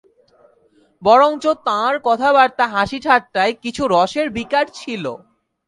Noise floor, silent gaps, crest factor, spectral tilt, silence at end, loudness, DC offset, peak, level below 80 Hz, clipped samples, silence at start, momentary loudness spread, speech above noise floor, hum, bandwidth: -56 dBFS; none; 18 dB; -4.5 dB/octave; 0.5 s; -17 LUFS; under 0.1%; 0 dBFS; -54 dBFS; under 0.1%; 1 s; 12 LU; 40 dB; none; 11.5 kHz